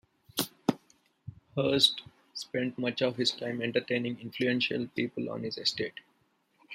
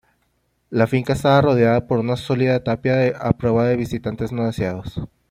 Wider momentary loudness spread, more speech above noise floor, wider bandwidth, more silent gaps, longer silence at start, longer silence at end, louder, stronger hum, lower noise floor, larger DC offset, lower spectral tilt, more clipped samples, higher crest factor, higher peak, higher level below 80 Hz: first, 17 LU vs 10 LU; second, 41 dB vs 48 dB; about the same, 16 kHz vs 15 kHz; neither; second, 0.35 s vs 0.7 s; second, 0 s vs 0.25 s; second, -30 LUFS vs -19 LUFS; neither; first, -71 dBFS vs -67 dBFS; neither; second, -4 dB/octave vs -7.5 dB/octave; neither; first, 26 dB vs 18 dB; second, -8 dBFS vs -2 dBFS; second, -70 dBFS vs -46 dBFS